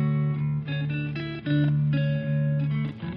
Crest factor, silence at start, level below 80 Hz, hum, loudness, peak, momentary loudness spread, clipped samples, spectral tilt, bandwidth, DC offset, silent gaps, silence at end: 12 dB; 0 s; -52 dBFS; none; -26 LUFS; -14 dBFS; 6 LU; under 0.1%; -7.5 dB/octave; 5 kHz; under 0.1%; none; 0 s